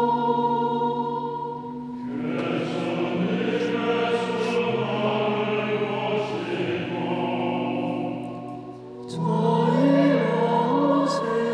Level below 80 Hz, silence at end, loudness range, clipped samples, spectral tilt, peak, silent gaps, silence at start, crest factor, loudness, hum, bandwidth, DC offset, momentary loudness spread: -66 dBFS; 0 s; 4 LU; under 0.1%; -7 dB/octave; -8 dBFS; none; 0 s; 16 dB; -24 LUFS; none; 11 kHz; under 0.1%; 12 LU